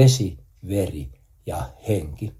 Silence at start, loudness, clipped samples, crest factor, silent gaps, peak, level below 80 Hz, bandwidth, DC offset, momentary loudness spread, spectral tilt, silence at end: 0 s; -26 LUFS; under 0.1%; 20 dB; none; -2 dBFS; -42 dBFS; 15 kHz; under 0.1%; 15 LU; -6 dB/octave; 0.05 s